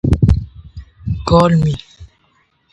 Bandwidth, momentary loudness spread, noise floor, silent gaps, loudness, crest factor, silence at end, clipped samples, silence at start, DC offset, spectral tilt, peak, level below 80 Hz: 11 kHz; 20 LU; -59 dBFS; none; -15 LUFS; 16 dB; 0.65 s; under 0.1%; 0.05 s; under 0.1%; -8 dB/octave; 0 dBFS; -24 dBFS